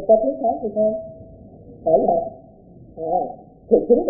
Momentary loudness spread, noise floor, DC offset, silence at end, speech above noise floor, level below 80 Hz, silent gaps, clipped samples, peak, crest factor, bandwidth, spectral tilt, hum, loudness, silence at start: 17 LU; -45 dBFS; under 0.1%; 0 s; 27 dB; -50 dBFS; none; under 0.1%; -2 dBFS; 18 dB; 0.9 kHz; -16.5 dB/octave; none; -21 LUFS; 0 s